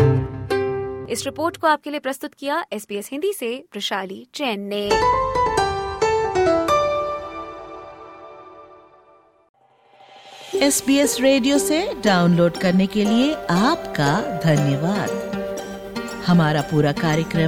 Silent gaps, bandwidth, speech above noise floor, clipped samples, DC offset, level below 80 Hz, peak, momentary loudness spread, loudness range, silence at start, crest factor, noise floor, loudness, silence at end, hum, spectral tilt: 9.49-9.54 s; 16.5 kHz; 34 dB; under 0.1%; under 0.1%; -46 dBFS; -4 dBFS; 13 LU; 8 LU; 0 s; 16 dB; -54 dBFS; -20 LUFS; 0 s; none; -5 dB/octave